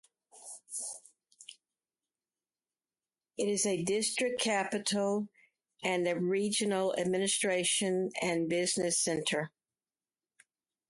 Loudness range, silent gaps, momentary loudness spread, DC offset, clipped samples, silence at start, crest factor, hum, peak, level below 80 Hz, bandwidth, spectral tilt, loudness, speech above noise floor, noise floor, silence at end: 8 LU; none; 17 LU; under 0.1%; under 0.1%; 0.35 s; 18 dB; none; -18 dBFS; -76 dBFS; 12 kHz; -3 dB/octave; -31 LUFS; over 59 dB; under -90 dBFS; 1.4 s